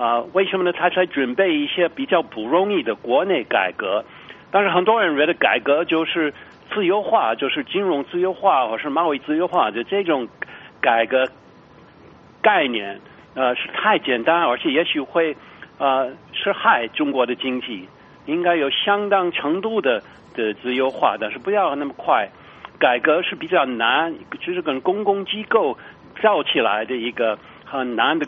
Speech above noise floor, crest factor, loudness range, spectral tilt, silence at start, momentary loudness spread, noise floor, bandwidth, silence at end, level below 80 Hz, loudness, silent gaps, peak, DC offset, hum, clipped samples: 27 dB; 20 dB; 2 LU; -1.5 dB/octave; 0 s; 8 LU; -47 dBFS; 5 kHz; 0 s; -64 dBFS; -20 LUFS; none; 0 dBFS; under 0.1%; none; under 0.1%